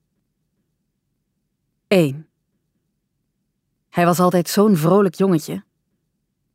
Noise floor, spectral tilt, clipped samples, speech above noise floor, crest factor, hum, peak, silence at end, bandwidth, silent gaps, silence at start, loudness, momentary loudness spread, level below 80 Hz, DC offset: -73 dBFS; -6.5 dB/octave; under 0.1%; 57 dB; 18 dB; none; -2 dBFS; 0.95 s; 16 kHz; none; 1.9 s; -17 LUFS; 14 LU; -68 dBFS; under 0.1%